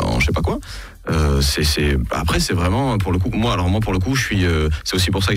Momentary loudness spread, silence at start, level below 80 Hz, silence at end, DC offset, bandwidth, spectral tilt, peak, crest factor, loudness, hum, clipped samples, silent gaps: 5 LU; 0 s; -26 dBFS; 0 s; under 0.1%; 16 kHz; -5 dB/octave; -6 dBFS; 12 dB; -19 LUFS; none; under 0.1%; none